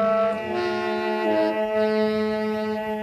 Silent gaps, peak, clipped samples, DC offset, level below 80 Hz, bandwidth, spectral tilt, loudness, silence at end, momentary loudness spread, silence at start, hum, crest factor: none; -12 dBFS; under 0.1%; under 0.1%; -60 dBFS; 13.5 kHz; -6.5 dB/octave; -24 LUFS; 0 s; 4 LU; 0 s; none; 12 dB